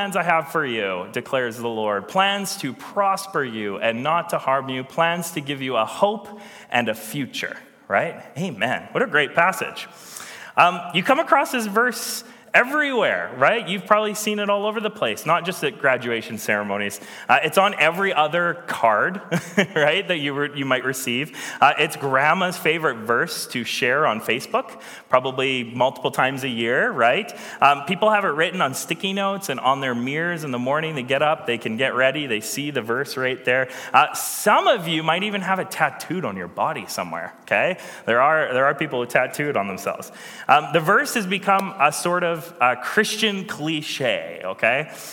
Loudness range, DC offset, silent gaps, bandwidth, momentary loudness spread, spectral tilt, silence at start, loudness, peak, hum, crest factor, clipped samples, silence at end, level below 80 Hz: 3 LU; under 0.1%; none; 17.5 kHz; 10 LU; -3.5 dB/octave; 0 s; -21 LUFS; 0 dBFS; none; 22 dB; under 0.1%; 0 s; -72 dBFS